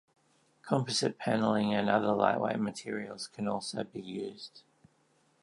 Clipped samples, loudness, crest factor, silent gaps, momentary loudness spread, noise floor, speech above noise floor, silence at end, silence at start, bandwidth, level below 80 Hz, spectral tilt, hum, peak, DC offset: under 0.1%; -32 LUFS; 22 dB; none; 12 LU; -70 dBFS; 39 dB; 0.85 s; 0.65 s; 11.5 kHz; -72 dBFS; -5 dB/octave; none; -10 dBFS; under 0.1%